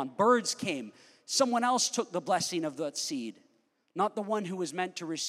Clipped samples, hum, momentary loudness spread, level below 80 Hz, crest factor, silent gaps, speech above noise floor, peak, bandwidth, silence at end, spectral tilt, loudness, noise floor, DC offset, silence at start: under 0.1%; none; 11 LU; -86 dBFS; 20 dB; none; 40 dB; -12 dBFS; 16 kHz; 0 s; -3 dB/octave; -30 LUFS; -71 dBFS; under 0.1%; 0 s